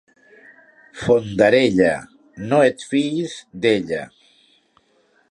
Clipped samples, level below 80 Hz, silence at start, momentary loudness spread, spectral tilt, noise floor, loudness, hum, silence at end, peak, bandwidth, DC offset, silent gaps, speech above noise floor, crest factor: under 0.1%; -54 dBFS; 0.95 s; 14 LU; -5.5 dB/octave; -60 dBFS; -19 LUFS; none; 1.25 s; -2 dBFS; 11 kHz; under 0.1%; none; 42 dB; 18 dB